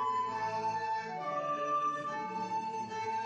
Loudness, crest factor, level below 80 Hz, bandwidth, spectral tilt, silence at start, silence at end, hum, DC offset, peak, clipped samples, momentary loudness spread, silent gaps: -35 LUFS; 12 dB; -80 dBFS; 8.8 kHz; -4.5 dB/octave; 0 s; 0 s; none; under 0.1%; -24 dBFS; under 0.1%; 5 LU; none